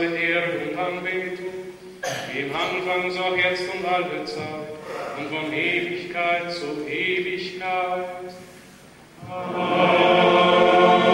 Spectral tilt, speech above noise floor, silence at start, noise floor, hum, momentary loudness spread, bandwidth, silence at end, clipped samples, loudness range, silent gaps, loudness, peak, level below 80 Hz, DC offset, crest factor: -5 dB/octave; 22 dB; 0 s; -47 dBFS; none; 17 LU; 16 kHz; 0 s; under 0.1%; 6 LU; none; -22 LUFS; -4 dBFS; -62 dBFS; under 0.1%; 18 dB